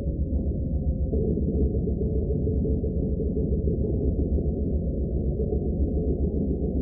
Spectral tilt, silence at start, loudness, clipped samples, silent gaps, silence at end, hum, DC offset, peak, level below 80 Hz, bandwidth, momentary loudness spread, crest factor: -19.5 dB/octave; 0 s; -27 LUFS; under 0.1%; none; 0 s; none; under 0.1%; -12 dBFS; -28 dBFS; 0.9 kHz; 2 LU; 14 dB